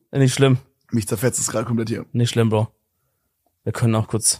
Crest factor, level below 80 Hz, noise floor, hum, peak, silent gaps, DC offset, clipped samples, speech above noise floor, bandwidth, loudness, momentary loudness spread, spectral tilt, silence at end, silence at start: 18 dB; -56 dBFS; -71 dBFS; none; -2 dBFS; none; under 0.1%; under 0.1%; 52 dB; 15.5 kHz; -21 LUFS; 9 LU; -5 dB/octave; 0 s; 0.15 s